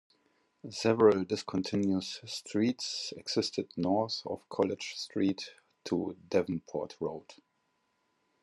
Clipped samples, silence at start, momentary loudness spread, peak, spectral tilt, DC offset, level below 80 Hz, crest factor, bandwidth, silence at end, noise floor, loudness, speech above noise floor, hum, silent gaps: under 0.1%; 0.65 s; 12 LU; -10 dBFS; -5 dB/octave; under 0.1%; -74 dBFS; 22 dB; 12 kHz; 1.1 s; -77 dBFS; -32 LUFS; 45 dB; none; none